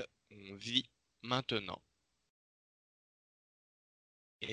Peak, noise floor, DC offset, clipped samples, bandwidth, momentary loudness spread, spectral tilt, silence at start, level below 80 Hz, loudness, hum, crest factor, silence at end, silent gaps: -14 dBFS; under -90 dBFS; under 0.1%; under 0.1%; 10.5 kHz; 18 LU; -4 dB/octave; 0 s; -76 dBFS; -38 LUFS; none; 30 dB; 0 s; 2.30-4.40 s